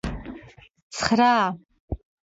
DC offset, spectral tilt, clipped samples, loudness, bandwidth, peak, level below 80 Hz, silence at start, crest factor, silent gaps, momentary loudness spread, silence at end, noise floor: under 0.1%; -4.5 dB/octave; under 0.1%; -22 LUFS; 8 kHz; -4 dBFS; -42 dBFS; 0.05 s; 22 dB; 0.82-0.90 s, 1.80-1.88 s; 22 LU; 0.4 s; -47 dBFS